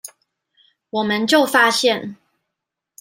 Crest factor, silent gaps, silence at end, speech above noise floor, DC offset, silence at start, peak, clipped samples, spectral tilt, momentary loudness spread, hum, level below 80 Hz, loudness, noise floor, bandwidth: 18 dB; none; 0.85 s; 65 dB; under 0.1%; 0.05 s; -2 dBFS; under 0.1%; -2.5 dB/octave; 17 LU; none; -68 dBFS; -17 LUFS; -82 dBFS; 16 kHz